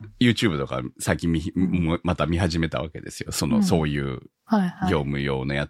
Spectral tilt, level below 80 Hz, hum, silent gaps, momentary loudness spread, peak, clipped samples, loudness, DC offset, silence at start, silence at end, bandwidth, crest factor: -5.5 dB/octave; -42 dBFS; none; none; 9 LU; -4 dBFS; under 0.1%; -24 LUFS; under 0.1%; 0 s; 0 s; 16 kHz; 20 dB